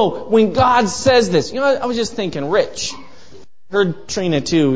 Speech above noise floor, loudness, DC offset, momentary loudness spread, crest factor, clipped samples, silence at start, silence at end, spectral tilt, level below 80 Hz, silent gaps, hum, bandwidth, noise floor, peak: 29 dB; -17 LUFS; 2%; 9 LU; 16 dB; under 0.1%; 0 s; 0 s; -4.5 dB/octave; -44 dBFS; none; none; 8 kHz; -46 dBFS; 0 dBFS